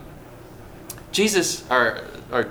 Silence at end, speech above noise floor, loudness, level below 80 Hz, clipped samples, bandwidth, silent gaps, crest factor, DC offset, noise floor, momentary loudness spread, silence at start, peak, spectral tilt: 0 s; 20 dB; -21 LUFS; -50 dBFS; under 0.1%; over 20 kHz; none; 20 dB; under 0.1%; -42 dBFS; 23 LU; 0 s; -4 dBFS; -2.5 dB/octave